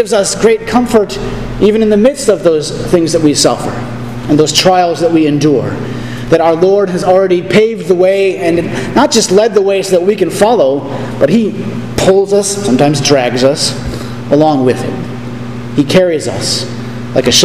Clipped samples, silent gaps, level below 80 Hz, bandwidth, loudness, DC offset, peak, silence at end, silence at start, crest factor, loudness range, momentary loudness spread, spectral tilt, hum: 0.5%; none; -36 dBFS; 16 kHz; -11 LUFS; 2%; 0 dBFS; 0 s; 0 s; 10 dB; 2 LU; 11 LU; -4.5 dB/octave; none